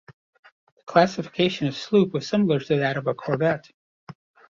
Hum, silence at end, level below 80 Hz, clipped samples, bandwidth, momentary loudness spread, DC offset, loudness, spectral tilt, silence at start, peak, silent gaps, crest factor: none; 0.4 s; -64 dBFS; under 0.1%; 7.4 kHz; 6 LU; under 0.1%; -23 LUFS; -6.5 dB/octave; 0.1 s; -4 dBFS; 0.13-0.33 s, 0.39-0.43 s, 0.52-0.77 s, 3.74-4.07 s; 22 dB